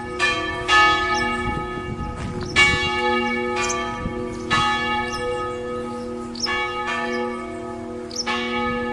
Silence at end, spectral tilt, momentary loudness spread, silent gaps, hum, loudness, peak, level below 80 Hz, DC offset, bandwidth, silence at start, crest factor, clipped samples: 0 s; -3.5 dB/octave; 14 LU; none; none; -22 LUFS; -2 dBFS; -40 dBFS; under 0.1%; 11.5 kHz; 0 s; 20 dB; under 0.1%